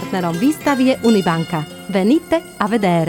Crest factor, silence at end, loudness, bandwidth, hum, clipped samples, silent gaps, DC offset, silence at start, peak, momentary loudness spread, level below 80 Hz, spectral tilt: 14 dB; 0 s; -17 LUFS; 19 kHz; none; under 0.1%; none; under 0.1%; 0 s; -2 dBFS; 7 LU; -52 dBFS; -6 dB/octave